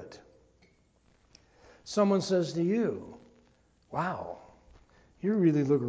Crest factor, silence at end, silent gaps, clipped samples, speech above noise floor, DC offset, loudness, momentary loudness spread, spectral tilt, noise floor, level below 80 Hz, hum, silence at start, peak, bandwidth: 18 dB; 0 s; none; under 0.1%; 39 dB; under 0.1%; -29 LUFS; 22 LU; -7 dB/octave; -66 dBFS; -66 dBFS; none; 0 s; -12 dBFS; 8 kHz